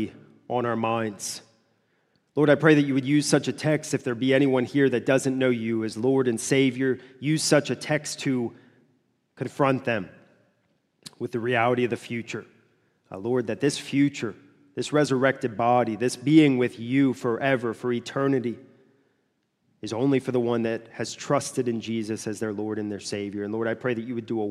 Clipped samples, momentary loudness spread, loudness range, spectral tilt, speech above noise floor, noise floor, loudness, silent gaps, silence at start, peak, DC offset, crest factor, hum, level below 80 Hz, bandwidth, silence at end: under 0.1%; 12 LU; 6 LU; -5.5 dB/octave; 48 dB; -72 dBFS; -25 LUFS; none; 0 s; -4 dBFS; under 0.1%; 20 dB; none; -72 dBFS; 13.5 kHz; 0 s